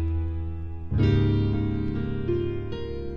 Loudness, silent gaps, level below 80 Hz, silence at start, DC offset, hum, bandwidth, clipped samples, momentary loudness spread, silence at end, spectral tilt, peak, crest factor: -27 LUFS; none; -34 dBFS; 0 s; 1%; none; 6.2 kHz; under 0.1%; 11 LU; 0 s; -10 dB/octave; -12 dBFS; 14 dB